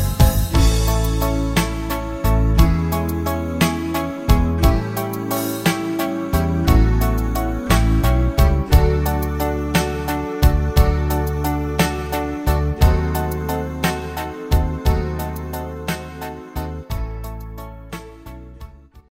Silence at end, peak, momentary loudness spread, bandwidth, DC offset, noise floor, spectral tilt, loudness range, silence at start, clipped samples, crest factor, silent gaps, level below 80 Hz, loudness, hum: 0.1 s; -2 dBFS; 13 LU; 16.5 kHz; under 0.1%; -39 dBFS; -6 dB/octave; 7 LU; 0 s; under 0.1%; 18 dB; none; -22 dBFS; -20 LUFS; none